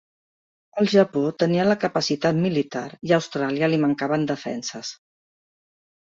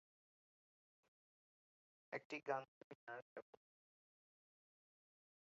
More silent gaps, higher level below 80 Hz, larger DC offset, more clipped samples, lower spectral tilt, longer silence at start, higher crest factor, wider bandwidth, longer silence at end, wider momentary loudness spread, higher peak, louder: second, none vs 2.25-2.30 s, 2.68-3.07 s, 3.22-3.36 s; first, -64 dBFS vs under -90 dBFS; neither; neither; first, -5.5 dB/octave vs -3 dB/octave; second, 0.75 s vs 2.1 s; second, 20 dB vs 28 dB; first, 7.8 kHz vs 6.8 kHz; second, 1.15 s vs 2.15 s; second, 11 LU vs 15 LU; first, -4 dBFS vs -28 dBFS; first, -22 LUFS vs -51 LUFS